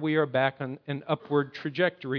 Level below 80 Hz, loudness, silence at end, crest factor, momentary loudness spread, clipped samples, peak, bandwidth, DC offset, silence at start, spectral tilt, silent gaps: -76 dBFS; -29 LUFS; 0 s; 20 dB; 9 LU; under 0.1%; -10 dBFS; 5.4 kHz; under 0.1%; 0 s; -8.5 dB/octave; none